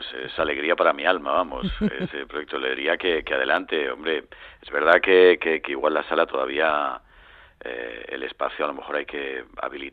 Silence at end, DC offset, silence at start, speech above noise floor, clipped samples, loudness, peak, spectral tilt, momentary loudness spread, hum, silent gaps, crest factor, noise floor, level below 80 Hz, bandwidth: 0.05 s; under 0.1%; 0 s; 27 dB; under 0.1%; -23 LUFS; -2 dBFS; -7 dB/octave; 15 LU; none; none; 22 dB; -50 dBFS; -48 dBFS; 4.7 kHz